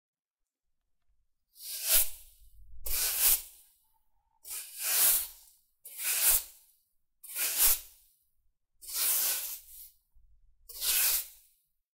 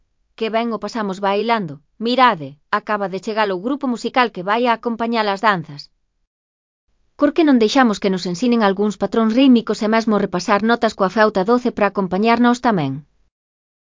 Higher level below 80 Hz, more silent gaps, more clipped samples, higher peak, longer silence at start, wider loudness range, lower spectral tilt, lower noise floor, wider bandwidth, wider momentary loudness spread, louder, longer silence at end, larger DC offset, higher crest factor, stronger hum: about the same, -52 dBFS vs -56 dBFS; second, none vs 6.27-6.88 s; neither; second, -10 dBFS vs 0 dBFS; first, 1.6 s vs 0.4 s; about the same, 2 LU vs 4 LU; second, 2.5 dB/octave vs -5.5 dB/octave; about the same, -89 dBFS vs under -90 dBFS; first, 16 kHz vs 7.6 kHz; first, 22 LU vs 9 LU; second, -27 LUFS vs -17 LUFS; second, 0.65 s vs 0.9 s; neither; first, 24 dB vs 18 dB; neither